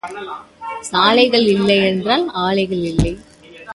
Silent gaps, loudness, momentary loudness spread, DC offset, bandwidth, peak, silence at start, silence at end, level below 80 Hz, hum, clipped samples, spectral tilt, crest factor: none; -15 LUFS; 18 LU; under 0.1%; 11.5 kHz; 0 dBFS; 0.05 s; 0 s; -36 dBFS; none; under 0.1%; -5 dB/octave; 16 dB